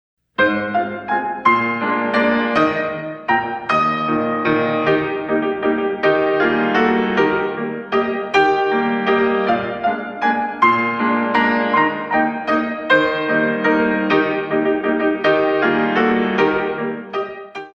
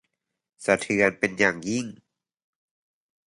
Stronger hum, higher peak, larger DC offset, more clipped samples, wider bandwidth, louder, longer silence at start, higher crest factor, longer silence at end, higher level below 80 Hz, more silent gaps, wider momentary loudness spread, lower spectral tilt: neither; first, -2 dBFS vs -6 dBFS; neither; neither; second, 7 kHz vs 11.5 kHz; first, -17 LUFS vs -24 LUFS; second, 0.4 s vs 0.6 s; second, 16 dB vs 22 dB; second, 0.05 s vs 1.3 s; first, -54 dBFS vs -62 dBFS; neither; second, 6 LU vs 10 LU; first, -6.5 dB/octave vs -4.5 dB/octave